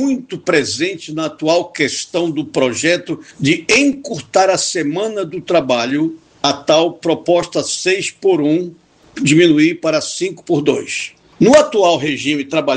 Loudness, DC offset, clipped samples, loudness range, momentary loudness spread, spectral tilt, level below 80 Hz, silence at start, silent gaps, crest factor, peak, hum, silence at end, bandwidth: -15 LUFS; under 0.1%; under 0.1%; 2 LU; 10 LU; -4 dB/octave; -56 dBFS; 0 s; none; 16 dB; 0 dBFS; none; 0 s; 9.6 kHz